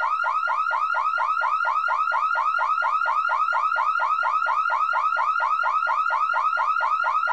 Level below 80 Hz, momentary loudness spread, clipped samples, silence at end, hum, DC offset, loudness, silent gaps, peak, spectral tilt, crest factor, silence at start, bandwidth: -84 dBFS; 1 LU; under 0.1%; 0 s; none; 0.2%; -22 LUFS; none; -12 dBFS; 1 dB/octave; 10 dB; 0 s; 8.8 kHz